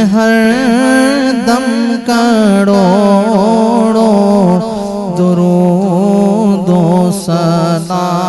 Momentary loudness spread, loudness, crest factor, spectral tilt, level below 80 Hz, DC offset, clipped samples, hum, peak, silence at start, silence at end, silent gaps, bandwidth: 5 LU; -10 LUFS; 10 dB; -6.5 dB/octave; -44 dBFS; under 0.1%; 0.4%; none; 0 dBFS; 0 s; 0 s; none; 12.5 kHz